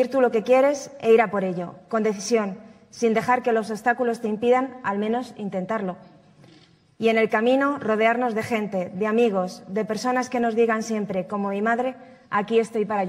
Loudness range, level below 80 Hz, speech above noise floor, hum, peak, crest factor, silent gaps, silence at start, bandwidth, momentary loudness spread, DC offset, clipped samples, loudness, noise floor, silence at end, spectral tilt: 3 LU; -70 dBFS; 32 dB; none; -6 dBFS; 18 dB; none; 0 s; 13 kHz; 9 LU; under 0.1%; under 0.1%; -23 LUFS; -54 dBFS; 0 s; -5.5 dB/octave